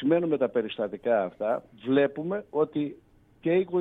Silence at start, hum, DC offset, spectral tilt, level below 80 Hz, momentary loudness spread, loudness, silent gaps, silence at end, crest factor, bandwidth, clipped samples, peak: 0 s; none; under 0.1%; -9 dB/octave; -66 dBFS; 8 LU; -28 LUFS; none; 0 s; 16 dB; 4 kHz; under 0.1%; -12 dBFS